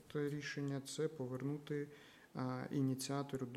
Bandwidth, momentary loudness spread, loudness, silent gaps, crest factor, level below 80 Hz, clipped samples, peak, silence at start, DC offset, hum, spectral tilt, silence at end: 15.5 kHz; 6 LU; -43 LUFS; none; 14 dB; -78 dBFS; under 0.1%; -28 dBFS; 0 s; under 0.1%; none; -6 dB/octave; 0 s